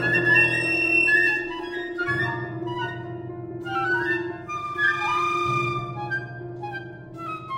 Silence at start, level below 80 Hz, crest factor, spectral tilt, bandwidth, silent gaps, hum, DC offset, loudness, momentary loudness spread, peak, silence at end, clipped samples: 0 s; -56 dBFS; 18 dB; -5.5 dB/octave; 16 kHz; none; none; under 0.1%; -22 LUFS; 18 LU; -6 dBFS; 0 s; under 0.1%